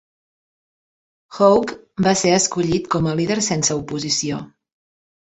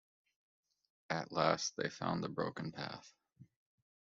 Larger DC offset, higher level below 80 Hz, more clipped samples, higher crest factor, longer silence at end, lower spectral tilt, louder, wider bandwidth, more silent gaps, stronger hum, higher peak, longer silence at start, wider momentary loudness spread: neither; first, -50 dBFS vs -76 dBFS; neither; second, 18 dB vs 26 dB; first, 0.85 s vs 0.65 s; about the same, -4 dB/octave vs -3.5 dB/octave; first, -18 LUFS vs -39 LUFS; first, 8.4 kHz vs 7.6 kHz; neither; neither; first, -2 dBFS vs -16 dBFS; first, 1.3 s vs 1.1 s; second, 9 LU vs 12 LU